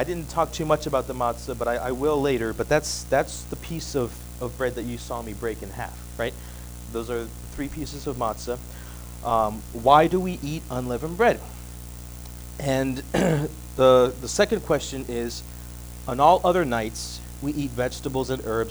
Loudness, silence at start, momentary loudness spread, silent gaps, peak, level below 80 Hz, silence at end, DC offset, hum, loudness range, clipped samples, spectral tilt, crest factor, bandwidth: -25 LUFS; 0 s; 18 LU; none; -2 dBFS; -40 dBFS; 0 s; under 0.1%; 60 Hz at -40 dBFS; 9 LU; under 0.1%; -5 dB/octave; 22 dB; over 20 kHz